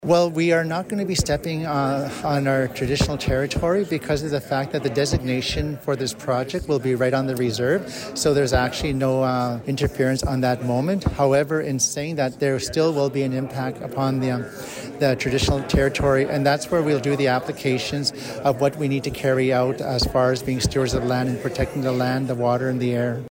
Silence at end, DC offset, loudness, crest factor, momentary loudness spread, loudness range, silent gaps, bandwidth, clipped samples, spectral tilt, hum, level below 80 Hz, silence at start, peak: 0 s; under 0.1%; -22 LUFS; 14 dB; 5 LU; 2 LU; none; 16.5 kHz; under 0.1%; -5 dB/octave; none; -38 dBFS; 0 s; -6 dBFS